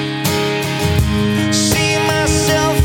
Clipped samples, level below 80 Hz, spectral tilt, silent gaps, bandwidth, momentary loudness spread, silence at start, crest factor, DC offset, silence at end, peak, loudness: under 0.1%; -28 dBFS; -4 dB/octave; none; 17.5 kHz; 4 LU; 0 s; 14 dB; under 0.1%; 0 s; -2 dBFS; -15 LUFS